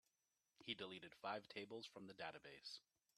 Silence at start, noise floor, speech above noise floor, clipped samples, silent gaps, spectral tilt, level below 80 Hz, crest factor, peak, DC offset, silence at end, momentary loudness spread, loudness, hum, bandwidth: 0.6 s; -90 dBFS; 35 dB; under 0.1%; none; -4 dB/octave; under -90 dBFS; 24 dB; -32 dBFS; under 0.1%; 0.4 s; 7 LU; -54 LUFS; none; 13 kHz